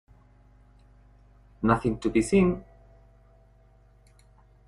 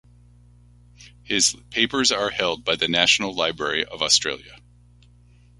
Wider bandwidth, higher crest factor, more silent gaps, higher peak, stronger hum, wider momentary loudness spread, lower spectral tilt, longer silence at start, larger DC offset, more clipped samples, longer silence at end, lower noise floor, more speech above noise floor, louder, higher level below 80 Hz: about the same, 11.5 kHz vs 11.5 kHz; about the same, 22 dB vs 24 dB; neither; second, -6 dBFS vs -2 dBFS; about the same, 50 Hz at -45 dBFS vs 60 Hz at -50 dBFS; about the same, 7 LU vs 7 LU; first, -7 dB/octave vs -1 dB/octave; first, 1.6 s vs 1 s; neither; neither; first, 2.05 s vs 1.05 s; first, -57 dBFS vs -52 dBFS; first, 34 dB vs 30 dB; second, -25 LUFS vs -20 LUFS; first, -48 dBFS vs -54 dBFS